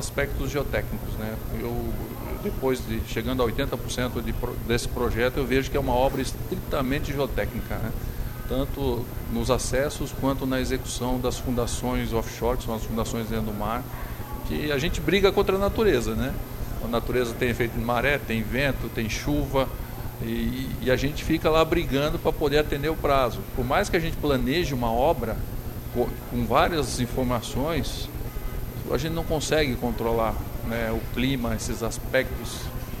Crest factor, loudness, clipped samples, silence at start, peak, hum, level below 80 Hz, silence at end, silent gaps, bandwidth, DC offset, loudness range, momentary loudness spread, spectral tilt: 20 dB; -26 LUFS; under 0.1%; 0 s; -6 dBFS; none; -34 dBFS; 0 s; none; 16.5 kHz; under 0.1%; 4 LU; 9 LU; -5.5 dB/octave